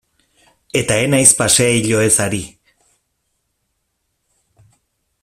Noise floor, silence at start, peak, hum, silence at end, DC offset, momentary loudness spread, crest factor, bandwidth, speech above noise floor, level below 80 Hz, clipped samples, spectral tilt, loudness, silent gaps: -70 dBFS; 0.75 s; 0 dBFS; none; 2.75 s; under 0.1%; 12 LU; 18 dB; 16 kHz; 56 dB; -48 dBFS; under 0.1%; -3 dB/octave; -13 LUFS; none